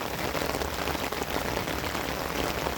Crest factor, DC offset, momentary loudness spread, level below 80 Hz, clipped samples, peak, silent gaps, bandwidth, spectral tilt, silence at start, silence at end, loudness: 20 dB; under 0.1%; 1 LU; -44 dBFS; under 0.1%; -10 dBFS; none; 19.5 kHz; -3.5 dB/octave; 0 s; 0 s; -30 LUFS